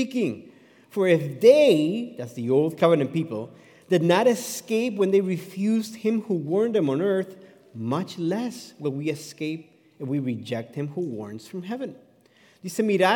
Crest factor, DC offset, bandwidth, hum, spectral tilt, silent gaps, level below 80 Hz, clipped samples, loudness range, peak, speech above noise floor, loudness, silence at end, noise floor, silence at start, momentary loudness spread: 20 dB; under 0.1%; 18 kHz; none; -6 dB/octave; none; -80 dBFS; under 0.1%; 10 LU; -4 dBFS; 34 dB; -24 LUFS; 0 s; -58 dBFS; 0 s; 15 LU